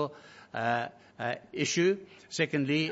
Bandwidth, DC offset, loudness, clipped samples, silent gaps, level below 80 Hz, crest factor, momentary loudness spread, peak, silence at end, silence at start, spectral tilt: 8 kHz; under 0.1%; -31 LUFS; under 0.1%; none; -74 dBFS; 18 dB; 13 LU; -12 dBFS; 0 s; 0 s; -4.5 dB/octave